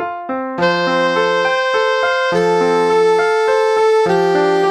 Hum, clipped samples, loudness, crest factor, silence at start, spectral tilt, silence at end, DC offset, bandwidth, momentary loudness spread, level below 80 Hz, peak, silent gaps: none; under 0.1%; -14 LUFS; 12 dB; 0 s; -4.5 dB/octave; 0 s; under 0.1%; 10.5 kHz; 3 LU; -56 dBFS; -2 dBFS; none